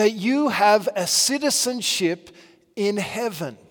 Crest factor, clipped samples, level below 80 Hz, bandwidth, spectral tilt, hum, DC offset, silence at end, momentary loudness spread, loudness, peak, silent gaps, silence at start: 18 dB; under 0.1%; -70 dBFS; 18 kHz; -2.5 dB/octave; none; under 0.1%; 0.15 s; 10 LU; -21 LUFS; -4 dBFS; none; 0 s